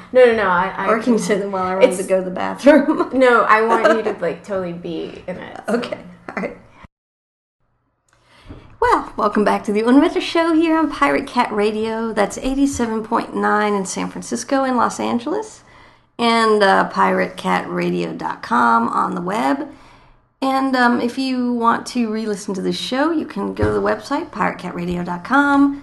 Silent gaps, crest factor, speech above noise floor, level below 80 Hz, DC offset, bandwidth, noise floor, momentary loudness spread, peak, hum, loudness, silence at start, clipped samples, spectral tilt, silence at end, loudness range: 6.92-7.59 s; 18 dB; 47 dB; -46 dBFS; under 0.1%; 12.5 kHz; -65 dBFS; 11 LU; 0 dBFS; none; -18 LUFS; 0 s; under 0.1%; -5 dB/octave; 0 s; 9 LU